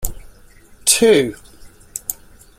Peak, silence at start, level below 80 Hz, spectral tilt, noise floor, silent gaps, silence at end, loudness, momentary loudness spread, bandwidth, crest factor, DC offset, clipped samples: 0 dBFS; 0 s; -38 dBFS; -2.5 dB/octave; -45 dBFS; none; 0.45 s; -16 LUFS; 19 LU; 16 kHz; 20 dB; under 0.1%; under 0.1%